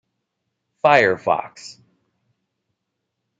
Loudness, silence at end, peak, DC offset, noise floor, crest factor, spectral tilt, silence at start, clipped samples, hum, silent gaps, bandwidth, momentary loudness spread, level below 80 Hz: -18 LUFS; 1.7 s; -2 dBFS; under 0.1%; -78 dBFS; 22 dB; -4.5 dB/octave; 0.85 s; under 0.1%; none; none; 9 kHz; 22 LU; -64 dBFS